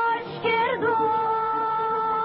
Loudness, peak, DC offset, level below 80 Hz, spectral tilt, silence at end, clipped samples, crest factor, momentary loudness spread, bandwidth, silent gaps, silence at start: -24 LUFS; -12 dBFS; under 0.1%; -64 dBFS; -2 dB/octave; 0 s; under 0.1%; 12 dB; 2 LU; 5.6 kHz; none; 0 s